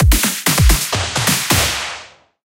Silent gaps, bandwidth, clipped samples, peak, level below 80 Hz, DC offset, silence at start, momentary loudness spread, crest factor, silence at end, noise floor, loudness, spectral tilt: none; 17.5 kHz; under 0.1%; 0 dBFS; -20 dBFS; under 0.1%; 0 s; 9 LU; 16 dB; 0.4 s; -37 dBFS; -15 LUFS; -3 dB/octave